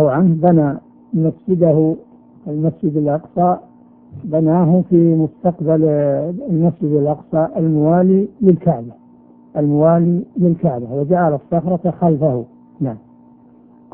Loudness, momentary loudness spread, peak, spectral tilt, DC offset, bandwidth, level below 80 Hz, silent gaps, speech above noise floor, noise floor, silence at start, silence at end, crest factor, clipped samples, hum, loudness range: -16 LUFS; 12 LU; 0 dBFS; -15 dB/octave; under 0.1%; 2.6 kHz; -52 dBFS; none; 31 dB; -46 dBFS; 0 s; 0.95 s; 16 dB; under 0.1%; none; 3 LU